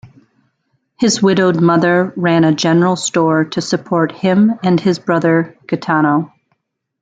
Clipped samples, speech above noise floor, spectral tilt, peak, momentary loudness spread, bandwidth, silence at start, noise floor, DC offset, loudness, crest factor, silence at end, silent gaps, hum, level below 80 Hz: under 0.1%; 53 dB; -5.5 dB/octave; -2 dBFS; 6 LU; 9.4 kHz; 0.05 s; -66 dBFS; under 0.1%; -14 LUFS; 14 dB; 0.75 s; none; none; -56 dBFS